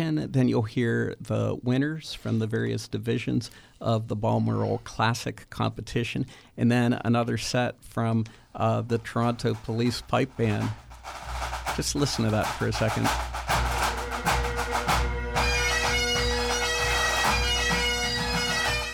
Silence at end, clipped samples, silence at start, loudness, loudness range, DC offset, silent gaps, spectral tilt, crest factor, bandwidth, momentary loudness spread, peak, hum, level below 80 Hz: 0 s; under 0.1%; 0 s; -26 LUFS; 4 LU; under 0.1%; none; -4.5 dB/octave; 16 dB; 19.5 kHz; 8 LU; -10 dBFS; none; -38 dBFS